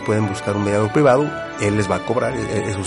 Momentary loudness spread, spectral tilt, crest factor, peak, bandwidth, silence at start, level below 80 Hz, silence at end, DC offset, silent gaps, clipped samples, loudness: 8 LU; -6 dB/octave; 16 dB; -4 dBFS; 11.5 kHz; 0 s; -46 dBFS; 0 s; under 0.1%; none; under 0.1%; -19 LUFS